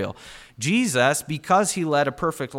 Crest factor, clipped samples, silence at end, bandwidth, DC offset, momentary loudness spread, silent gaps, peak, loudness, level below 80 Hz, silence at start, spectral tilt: 16 dB; under 0.1%; 0 s; 16.5 kHz; under 0.1%; 12 LU; none; -6 dBFS; -22 LUFS; -56 dBFS; 0 s; -4 dB/octave